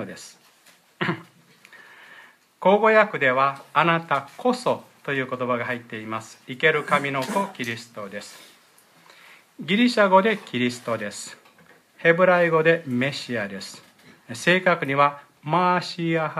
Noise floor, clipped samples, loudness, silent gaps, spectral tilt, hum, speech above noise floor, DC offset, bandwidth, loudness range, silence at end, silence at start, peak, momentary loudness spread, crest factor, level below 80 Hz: -56 dBFS; under 0.1%; -22 LUFS; none; -5 dB/octave; none; 34 dB; under 0.1%; 15 kHz; 5 LU; 0 s; 0 s; -4 dBFS; 18 LU; 20 dB; -74 dBFS